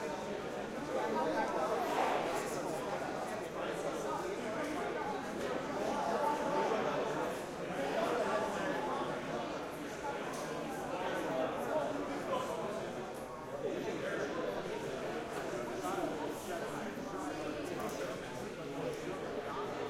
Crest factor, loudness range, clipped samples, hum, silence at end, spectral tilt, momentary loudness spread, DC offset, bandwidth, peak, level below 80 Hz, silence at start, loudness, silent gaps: 18 dB; 4 LU; under 0.1%; none; 0 s; -4.5 dB/octave; 7 LU; under 0.1%; 16.5 kHz; -20 dBFS; -66 dBFS; 0 s; -38 LUFS; none